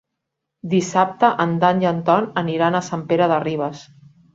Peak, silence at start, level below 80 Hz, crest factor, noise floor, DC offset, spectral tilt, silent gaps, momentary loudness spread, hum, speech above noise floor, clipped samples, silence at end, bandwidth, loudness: -2 dBFS; 0.65 s; -62 dBFS; 18 dB; -79 dBFS; under 0.1%; -6 dB/octave; none; 7 LU; none; 61 dB; under 0.1%; 0.55 s; 7.8 kHz; -19 LUFS